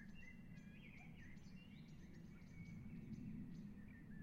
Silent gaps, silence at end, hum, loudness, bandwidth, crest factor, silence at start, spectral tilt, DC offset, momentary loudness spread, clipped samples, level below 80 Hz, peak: none; 0 s; none; -58 LUFS; 16 kHz; 14 dB; 0 s; -7 dB/octave; under 0.1%; 7 LU; under 0.1%; -66 dBFS; -42 dBFS